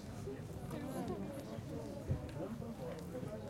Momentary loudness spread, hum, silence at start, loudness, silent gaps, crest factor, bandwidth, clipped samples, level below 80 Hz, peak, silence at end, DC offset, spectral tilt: 4 LU; none; 0 s; -45 LUFS; none; 18 dB; 16.5 kHz; under 0.1%; -58 dBFS; -26 dBFS; 0 s; under 0.1%; -7 dB/octave